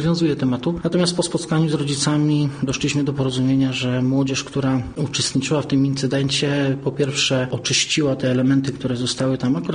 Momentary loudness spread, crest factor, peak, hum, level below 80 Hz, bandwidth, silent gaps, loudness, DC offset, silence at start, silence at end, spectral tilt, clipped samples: 4 LU; 14 dB; -6 dBFS; none; -48 dBFS; 10 kHz; none; -20 LUFS; under 0.1%; 0 s; 0 s; -5 dB/octave; under 0.1%